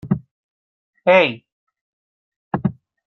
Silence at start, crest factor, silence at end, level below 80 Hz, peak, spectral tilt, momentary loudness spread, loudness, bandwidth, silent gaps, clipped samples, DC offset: 0.05 s; 20 dB; 0.35 s; -54 dBFS; -2 dBFS; -7.5 dB/octave; 13 LU; -19 LUFS; 6.4 kHz; 0.31-0.93 s, 1.52-1.67 s, 1.81-2.51 s; under 0.1%; under 0.1%